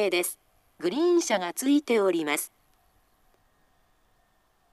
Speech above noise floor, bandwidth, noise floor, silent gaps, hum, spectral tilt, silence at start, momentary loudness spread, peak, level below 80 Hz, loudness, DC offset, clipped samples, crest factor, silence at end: 42 dB; 13.5 kHz; -68 dBFS; none; none; -3 dB/octave; 0 s; 10 LU; -12 dBFS; -72 dBFS; -26 LUFS; under 0.1%; under 0.1%; 16 dB; 2.25 s